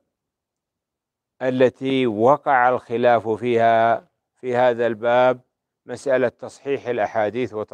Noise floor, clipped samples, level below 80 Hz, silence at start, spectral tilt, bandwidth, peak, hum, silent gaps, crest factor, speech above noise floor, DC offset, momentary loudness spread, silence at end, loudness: -84 dBFS; under 0.1%; -72 dBFS; 1.4 s; -6.5 dB/octave; 9.8 kHz; -2 dBFS; none; none; 18 dB; 65 dB; under 0.1%; 11 LU; 0.1 s; -20 LUFS